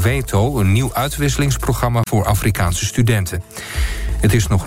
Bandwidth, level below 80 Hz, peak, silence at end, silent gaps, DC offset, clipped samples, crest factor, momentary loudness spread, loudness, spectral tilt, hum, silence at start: 16 kHz; -26 dBFS; -4 dBFS; 0 s; none; under 0.1%; under 0.1%; 12 dB; 7 LU; -18 LUFS; -5.5 dB/octave; none; 0 s